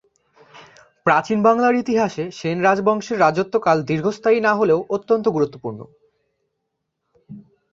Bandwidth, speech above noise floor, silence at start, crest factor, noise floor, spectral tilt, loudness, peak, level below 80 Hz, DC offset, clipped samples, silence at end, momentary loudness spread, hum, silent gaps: 7.6 kHz; 58 dB; 0.55 s; 18 dB; -76 dBFS; -6.5 dB/octave; -19 LUFS; -2 dBFS; -62 dBFS; under 0.1%; under 0.1%; 0.3 s; 8 LU; none; none